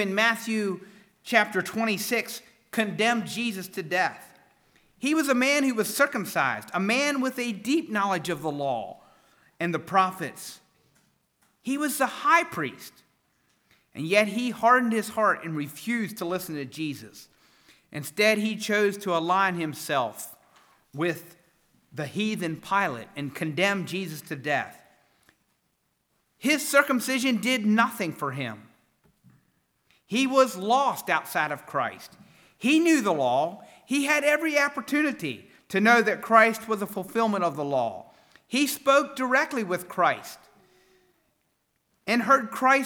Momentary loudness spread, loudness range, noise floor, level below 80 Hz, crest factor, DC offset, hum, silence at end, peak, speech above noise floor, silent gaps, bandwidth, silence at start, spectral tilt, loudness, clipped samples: 14 LU; 6 LU; -74 dBFS; -76 dBFS; 24 dB; under 0.1%; none; 0 s; -4 dBFS; 48 dB; none; over 20 kHz; 0 s; -4 dB/octave; -25 LUFS; under 0.1%